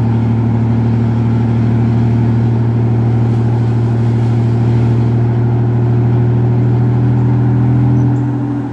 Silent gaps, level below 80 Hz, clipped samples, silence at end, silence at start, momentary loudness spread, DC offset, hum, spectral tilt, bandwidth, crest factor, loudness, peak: none; -34 dBFS; under 0.1%; 0 s; 0 s; 2 LU; under 0.1%; none; -10.5 dB/octave; 4.4 kHz; 10 dB; -13 LUFS; -2 dBFS